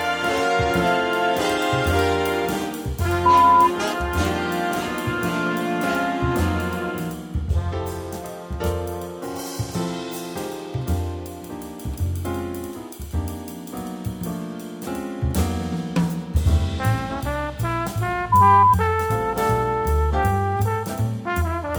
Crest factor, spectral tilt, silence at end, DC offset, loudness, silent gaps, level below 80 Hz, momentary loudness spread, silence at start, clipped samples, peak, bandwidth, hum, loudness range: 18 dB; -6 dB/octave; 0 s; under 0.1%; -22 LUFS; none; -32 dBFS; 14 LU; 0 s; under 0.1%; -4 dBFS; over 20 kHz; none; 10 LU